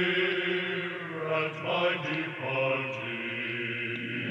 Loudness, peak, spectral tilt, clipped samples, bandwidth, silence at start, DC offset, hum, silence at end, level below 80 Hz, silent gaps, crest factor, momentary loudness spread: -30 LUFS; -16 dBFS; -6 dB/octave; under 0.1%; 8.4 kHz; 0 s; under 0.1%; none; 0 s; -84 dBFS; none; 16 dB; 6 LU